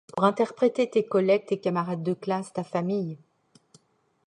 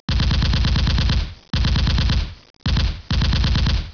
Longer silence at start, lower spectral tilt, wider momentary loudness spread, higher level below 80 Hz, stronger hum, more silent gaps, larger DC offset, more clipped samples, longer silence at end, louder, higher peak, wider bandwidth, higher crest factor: about the same, 0.15 s vs 0.1 s; first, -7 dB/octave vs -5.5 dB/octave; first, 8 LU vs 5 LU; second, -74 dBFS vs -22 dBFS; neither; second, none vs 2.50-2.54 s; second, under 0.1% vs 0.3%; neither; first, 1.1 s vs 0 s; second, -26 LUFS vs -20 LUFS; about the same, -8 dBFS vs -10 dBFS; first, 10.5 kHz vs 5.4 kHz; first, 18 dB vs 10 dB